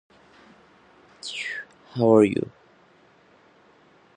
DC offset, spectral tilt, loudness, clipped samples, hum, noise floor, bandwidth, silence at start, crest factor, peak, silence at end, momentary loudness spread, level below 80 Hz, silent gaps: under 0.1%; -6.5 dB/octave; -22 LUFS; under 0.1%; none; -57 dBFS; 10 kHz; 1.25 s; 22 dB; -4 dBFS; 1.7 s; 20 LU; -64 dBFS; none